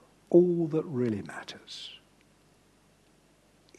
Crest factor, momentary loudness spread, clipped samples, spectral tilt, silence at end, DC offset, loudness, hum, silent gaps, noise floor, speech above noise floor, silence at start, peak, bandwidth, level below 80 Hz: 22 dB; 19 LU; under 0.1%; -7.5 dB/octave; 1.8 s; under 0.1%; -27 LUFS; 50 Hz at -65 dBFS; none; -63 dBFS; 36 dB; 0.3 s; -8 dBFS; 9.2 kHz; -72 dBFS